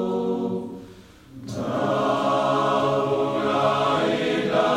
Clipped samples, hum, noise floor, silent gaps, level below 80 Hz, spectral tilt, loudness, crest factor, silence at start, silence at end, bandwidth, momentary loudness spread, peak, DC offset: under 0.1%; none; -46 dBFS; none; -58 dBFS; -6 dB/octave; -23 LUFS; 14 dB; 0 s; 0 s; 14.5 kHz; 11 LU; -8 dBFS; under 0.1%